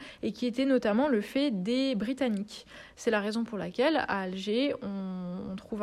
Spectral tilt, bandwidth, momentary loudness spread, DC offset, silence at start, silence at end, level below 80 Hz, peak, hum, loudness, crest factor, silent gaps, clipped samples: -5.5 dB/octave; 13 kHz; 11 LU; under 0.1%; 0 s; 0 s; -64 dBFS; -16 dBFS; none; -30 LUFS; 16 dB; none; under 0.1%